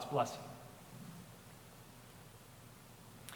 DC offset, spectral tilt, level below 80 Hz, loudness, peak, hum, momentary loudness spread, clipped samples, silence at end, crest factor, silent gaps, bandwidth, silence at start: under 0.1%; -5 dB/octave; -70 dBFS; -48 LUFS; -22 dBFS; none; 18 LU; under 0.1%; 0 s; 26 dB; none; over 20 kHz; 0 s